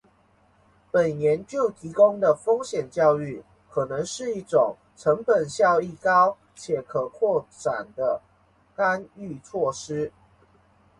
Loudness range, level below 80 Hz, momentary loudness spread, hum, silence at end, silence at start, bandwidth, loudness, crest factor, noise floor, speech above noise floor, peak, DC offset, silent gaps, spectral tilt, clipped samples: 5 LU; -64 dBFS; 12 LU; none; 0.9 s; 0.95 s; 11.5 kHz; -24 LUFS; 18 dB; -61 dBFS; 38 dB; -6 dBFS; under 0.1%; none; -5 dB/octave; under 0.1%